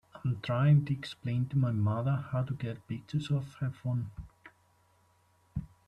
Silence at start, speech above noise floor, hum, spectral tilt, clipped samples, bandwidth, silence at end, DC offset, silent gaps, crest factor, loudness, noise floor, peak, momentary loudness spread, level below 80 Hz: 0.15 s; 37 dB; none; -8.5 dB/octave; under 0.1%; 9 kHz; 0.2 s; under 0.1%; none; 16 dB; -32 LUFS; -68 dBFS; -16 dBFS; 16 LU; -58 dBFS